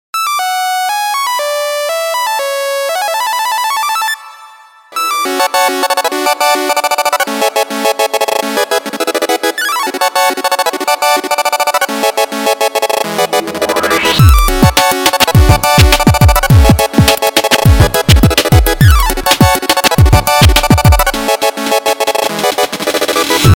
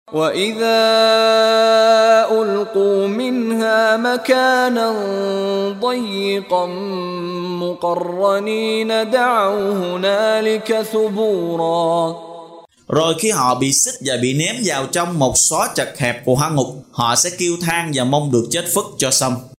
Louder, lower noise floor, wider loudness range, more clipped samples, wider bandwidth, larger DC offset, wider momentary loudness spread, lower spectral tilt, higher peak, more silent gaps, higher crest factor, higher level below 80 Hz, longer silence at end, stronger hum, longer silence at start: first, -11 LUFS vs -16 LUFS; about the same, -38 dBFS vs -40 dBFS; about the same, 6 LU vs 5 LU; first, 0.9% vs under 0.1%; first, over 20 kHz vs 16 kHz; neither; about the same, 7 LU vs 8 LU; about the same, -4 dB/octave vs -3.5 dB/octave; about the same, 0 dBFS vs -2 dBFS; neither; second, 10 dB vs 16 dB; first, -18 dBFS vs -54 dBFS; about the same, 0 s vs 0.1 s; neither; about the same, 0.15 s vs 0.1 s